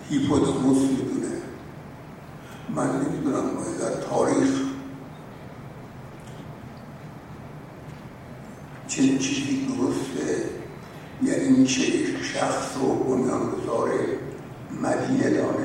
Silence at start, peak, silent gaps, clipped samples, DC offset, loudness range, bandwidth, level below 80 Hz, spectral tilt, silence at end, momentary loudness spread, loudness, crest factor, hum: 0 s; -8 dBFS; none; under 0.1%; under 0.1%; 15 LU; 12 kHz; -54 dBFS; -5 dB/octave; 0 s; 20 LU; -24 LUFS; 18 dB; none